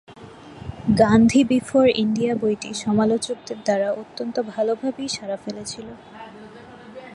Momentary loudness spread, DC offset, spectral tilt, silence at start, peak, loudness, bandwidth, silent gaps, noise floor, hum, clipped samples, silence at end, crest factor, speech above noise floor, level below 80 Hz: 24 LU; under 0.1%; -5.5 dB/octave; 0.1 s; -4 dBFS; -21 LUFS; 11.5 kHz; none; -42 dBFS; none; under 0.1%; 0 s; 18 dB; 22 dB; -50 dBFS